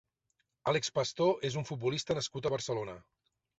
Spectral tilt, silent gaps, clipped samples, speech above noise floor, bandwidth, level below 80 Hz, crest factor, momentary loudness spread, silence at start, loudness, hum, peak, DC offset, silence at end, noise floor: -4.5 dB/octave; none; under 0.1%; 47 dB; 8.2 kHz; -66 dBFS; 18 dB; 8 LU; 0.65 s; -33 LUFS; none; -16 dBFS; under 0.1%; 0.6 s; -81 dBFS